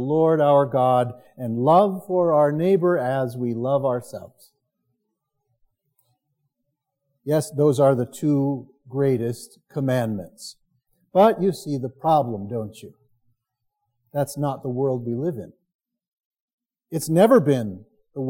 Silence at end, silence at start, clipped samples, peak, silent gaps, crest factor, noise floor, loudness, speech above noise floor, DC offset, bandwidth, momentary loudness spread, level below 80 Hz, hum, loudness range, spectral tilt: 0 s; 0 s; under 0.1%; -4 dBFS; 15.74-15.79 s, 16.08-16.31 s, 16.40-16.58 s; 18 dB; -78 dBFS; -21 LUFS; 58 dB; under 0.1%; 17 kHz; 16 LU; -70 dBFS; none; 9 LU; -7.5 dB/octave